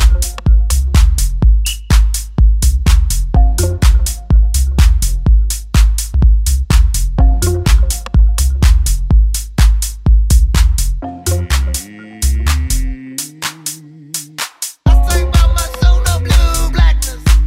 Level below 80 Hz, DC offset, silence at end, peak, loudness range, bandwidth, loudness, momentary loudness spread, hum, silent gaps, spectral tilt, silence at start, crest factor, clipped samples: -12 dBFS; under 0.1%; 0 s; 0 dBFS; 4 LU; 16 kHz; -14 LUFS; 8 LU; none; none; -4.5 dB/octave; 0 s; 10 dB; under 0.1%